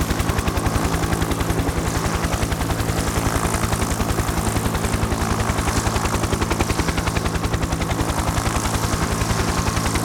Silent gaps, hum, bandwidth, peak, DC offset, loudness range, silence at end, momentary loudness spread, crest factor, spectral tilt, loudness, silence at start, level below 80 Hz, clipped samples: none; none; over 20 kHz; -4 dBFS; under 0.1%; 0 LU; 0 s; 2 LU; 18 dB; -4.5 dB/octave; -21 LUFS; 0 s; -28 dBFS; under 0.1%